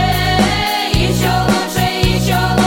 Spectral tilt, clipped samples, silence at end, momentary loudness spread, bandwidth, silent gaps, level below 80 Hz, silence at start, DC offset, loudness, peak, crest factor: -4.5 dB/octave; under 0.1%; 0 s; 2 LU; 17 kHz; none; -26 dBFS; 0 s; under 0.1%; -14 LUFS; 0 dBFS; 14 dB